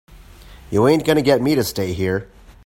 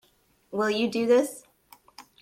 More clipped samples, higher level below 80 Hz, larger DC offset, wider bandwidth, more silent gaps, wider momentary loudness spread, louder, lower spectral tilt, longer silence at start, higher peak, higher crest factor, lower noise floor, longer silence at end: neither; first, -44 dBFS vs -72 dBFS; neither; about the same, 16.5 kHz vs 16 kHz; neither; second, 8 LU vs 13 LU; first, -18 LUFS vs -25 LUFS; first, -6 dB/octave vs -4.5 dB/octave; about the same, 0.5 s vs 0.5 s; first, -2 dBFS vs -10 dBFS; about the same, 18 dB vs 18 dB; second, -42 dBFS vs -57 dBFS; first, 0.4 s vs 0.2 s